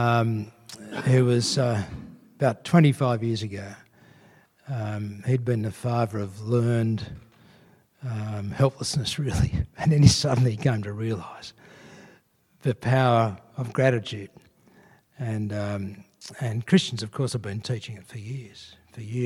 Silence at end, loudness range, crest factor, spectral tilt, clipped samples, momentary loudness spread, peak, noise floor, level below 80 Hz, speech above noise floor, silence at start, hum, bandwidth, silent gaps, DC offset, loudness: 0 s; 6 LU; 24 dB; -6 dB/octave; under 0.1%; 19 LU; -2 dBFS; -61 dBFS; -46 dBFS; 36 dB; 0 s; none; 13 kHz; none; under 0.1%; -25 LUFS